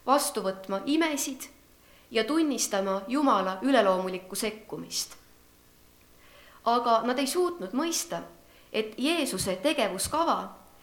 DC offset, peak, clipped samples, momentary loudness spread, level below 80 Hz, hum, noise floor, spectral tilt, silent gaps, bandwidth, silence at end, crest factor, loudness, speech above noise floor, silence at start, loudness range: under 0.1%; -10 dBFS; under 0.1%; 9 LU; -62 dBFS; 60 Hz at -60 dBFS; -58 dBFS; -3 dB/octave; none; 19 kHz; 0.25 s; 20 dB; -28 LUFS; 30 dB; 0.05 s; 3 LU